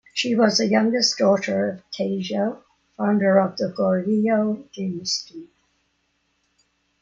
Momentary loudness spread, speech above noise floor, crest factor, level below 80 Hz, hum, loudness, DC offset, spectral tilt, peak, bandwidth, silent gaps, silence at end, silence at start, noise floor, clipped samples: 10 LU; 49 dB; 18 dB; -66 dBFS; none; -21 LUFS; under 0.1%; -4.5 dB/octave; -6 dBFS; 7.6 kHz; none; 1.55 s; 0.15 s; -70 dBFS; under 0.1%